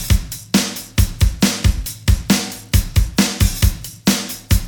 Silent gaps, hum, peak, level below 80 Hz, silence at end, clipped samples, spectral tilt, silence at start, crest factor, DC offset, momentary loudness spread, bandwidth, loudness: none; none; 0 dBFS; -20 dBFS; 0 s; under 0.1%; -4 dB/octave; 0 s; 16 dB; under 0.1%; 4 LU; over 20 kHz; -18 LUFS